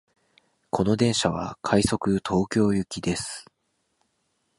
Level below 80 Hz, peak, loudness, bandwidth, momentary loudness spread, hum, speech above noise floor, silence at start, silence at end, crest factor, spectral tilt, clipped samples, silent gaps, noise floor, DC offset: -48 dBFS; -6 dBFS; -25 LUFS; 11.5 kHz; 9 LU; none; 49 dB; 0.75 s; 1.15 s; 20 dB; -5 dB/octave; under 0.1%; none; -73 dBFS; under 0.1%